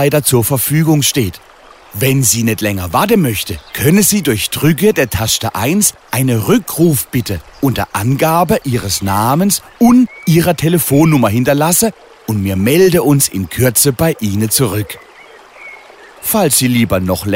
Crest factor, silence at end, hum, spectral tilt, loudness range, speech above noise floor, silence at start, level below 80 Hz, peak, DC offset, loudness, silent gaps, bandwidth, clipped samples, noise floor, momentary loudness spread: 12 dB; 0 s; none; -4.5 dB/octave; 3 LU; 26 dB; 0 s; -40 dBFS; 0 dBFS; under 0.1%; -12 LUFS; none; 16.5 kHz; under 0.1%; -39 dBFS; 8 LU